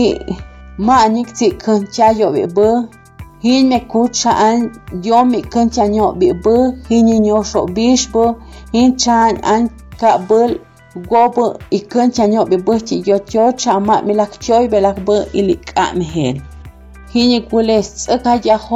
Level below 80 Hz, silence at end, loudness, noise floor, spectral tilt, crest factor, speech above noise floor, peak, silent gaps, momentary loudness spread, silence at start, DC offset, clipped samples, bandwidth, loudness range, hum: -38 dBFS; 0 s; -13 LUFS; -35 dBFS; -5 dB/octave; 12 dB; 22 dB; 0 dBFS; none; 8 LU; 0 s; under 0.1%; under 0.1%; 8.8 kHz; 2 LU; none